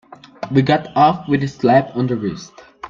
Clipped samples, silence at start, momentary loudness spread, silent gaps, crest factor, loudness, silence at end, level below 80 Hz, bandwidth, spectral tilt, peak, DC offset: under 0.1%; 0.4 s; 11 LU; none; 16 dB; -17 LUFS; 0 s; -52 dBFS; 7.4 kHz; -7.5 dB/octave; 0 dBFS; under 0.1%